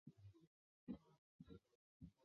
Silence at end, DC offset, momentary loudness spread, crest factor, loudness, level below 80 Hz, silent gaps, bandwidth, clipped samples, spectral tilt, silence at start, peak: 0 s; under 0.1%; 11 LU; 22 dB; -63 LUFS; -78 dBFS; 0.47-0.87 s, 1.18-1.39 s, 1.75-2.00 s; 6.4 kHz; under 0.1%; -8.5 dB/octave; 0.05 s; -40 dBFS